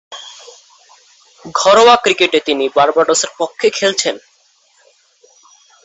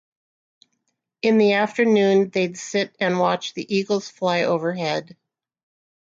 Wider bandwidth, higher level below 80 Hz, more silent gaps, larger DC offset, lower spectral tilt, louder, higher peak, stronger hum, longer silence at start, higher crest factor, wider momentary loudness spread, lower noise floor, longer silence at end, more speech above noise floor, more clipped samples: about the same, 8.4 kHz vs 7.8 kHz; first, -60 dBFS vs -70 dBFS; neither; neither; second, -1.5 dB/octave vs -5 dB/octave; first, -12 LUFS vs -21 LUFS; first, 0 dBFS vs -6 dBFS; neither; second, 0.1 s vs 1.25 s; about the same, 16 dB vs 16 dB; first, 21 LU vs 8 LU; second, -54 dBFS vs -75 dBFS; first, 1.7 s vs 1.1 s; second, 42 dB vs 54 dB; neither